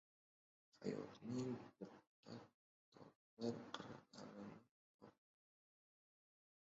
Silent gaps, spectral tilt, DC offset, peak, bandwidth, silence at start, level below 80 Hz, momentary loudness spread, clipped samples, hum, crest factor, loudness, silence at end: 2.07-2.23 s, 2.54-2.92 s, 3.16-3.37 s, 4.71-4.99 s; -6 dB/octave; under 0.1%; -30 dBFS; 7.6 kHz; 0.75 s; -88 dBFS; 19 LU; under 0.1%; none; 24 dB; -52 LUFS; 1.6 s